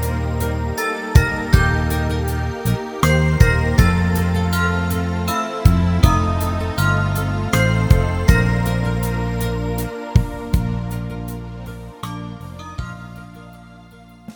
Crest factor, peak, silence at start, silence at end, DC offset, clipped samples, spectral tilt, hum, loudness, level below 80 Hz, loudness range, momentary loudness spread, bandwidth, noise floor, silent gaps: 18 dB; 0 dBFS; 0 s; 0.05 s; under 0.1%; under 0.1%; -6 dB/octave; none; -19 LUFS; -24 dBFS; 9 LU; 15 LU; over 20 kHz; -43 dBFS; none